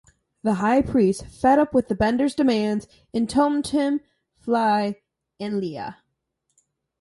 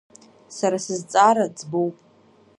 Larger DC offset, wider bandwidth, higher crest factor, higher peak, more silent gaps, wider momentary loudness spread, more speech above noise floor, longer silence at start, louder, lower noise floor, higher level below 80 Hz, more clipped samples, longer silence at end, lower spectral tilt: neither; about the same, 11.5 kHz vs 11.5 kHz; about the same, 18 dB vs 20 dB; about the same, -6 dBFS vs -4 dBFS; neither; about the same, 12 LU vs 11 LU; first, 54 dB vs 34 dB; about the same, 0.45 s vs 0.5 s; about the same, -22 LUFS vs -21 LUFS; first, -76 dBFS vs -55 dBFS; first, -50 dBFS vs -76 dBFS; neither; first, 1.05 s vs 0.65 s; first, -6 dB/octave vs -4.5 dB/octave